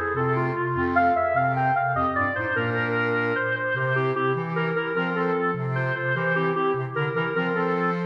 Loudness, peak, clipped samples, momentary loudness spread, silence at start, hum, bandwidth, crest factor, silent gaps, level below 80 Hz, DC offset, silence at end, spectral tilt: -24 LUFS; -8 dBFS; under 0.1%; 3 LU; 0 s; none; 6 kHz; 14 dB; none; -56 dBFS; under 0.1%; 0 s; -8.5 dB/octave